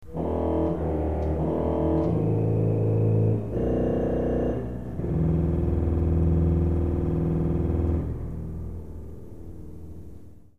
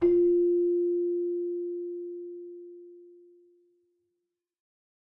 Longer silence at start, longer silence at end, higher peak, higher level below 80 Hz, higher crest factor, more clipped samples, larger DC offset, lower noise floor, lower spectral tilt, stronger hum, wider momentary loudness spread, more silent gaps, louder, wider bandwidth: about the same, 0 s vs 0 s; second, 0 s vs 2.05 s; about the same, -12 dBFS vs -14 dBFS; first, -32 dBFS vs -64 dBFS; about the same, 12 dB vs 16 dB; neither; first, 0.8% vs under 0.1%; second, -46 dBFS vs -84 dBFS; about the same, -11 dB/octave vs -10.5 dB/octave; neither; second, 18 LU vs 22 LU; neither; about the same, -26 LUFS vs -28 LUFS; first, 3.5 kHz vs 2.2 kHz